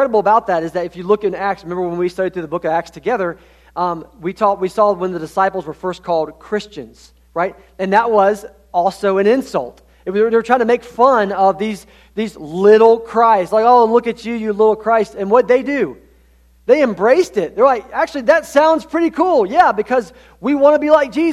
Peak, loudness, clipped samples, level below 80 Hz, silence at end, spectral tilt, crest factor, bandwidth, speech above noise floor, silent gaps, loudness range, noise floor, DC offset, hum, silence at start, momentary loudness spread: 0 dBFS; -15 LUFS; under 0.1%; -50 dBFS; 0 s; -6 dB/octave; 16 dB; 13.5 kHz; 35 dB; none; 6 LU; -50 dBFS; under 0.1%; none; 0 s; 12 LU